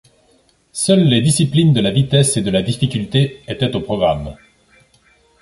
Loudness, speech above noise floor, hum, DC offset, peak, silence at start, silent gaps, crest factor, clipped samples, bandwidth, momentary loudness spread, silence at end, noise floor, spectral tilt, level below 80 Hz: -16 LUFS; 41 dB; none; under 0.1%; -2 dBFS; 0.75 s; none; 16 dB; under 0.1%; 11.5 kHz; 8 LU; 1.1 s; -56 dBFS; -5.5 dB/octave; -42 dBFS